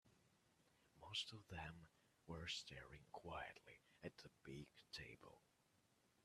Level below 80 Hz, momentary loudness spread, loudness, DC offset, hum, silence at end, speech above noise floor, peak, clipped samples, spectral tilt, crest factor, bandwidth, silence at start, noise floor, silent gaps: -76 dBFS; 16 LU; -54 LUFS; under 0.1%; none; 0.05 s; 25 dB; -34 dBFS; under 0.1%; -3.5 dB/octave; 24 dB; 13.5 kHz; 0.05 s; -81 dBFS; none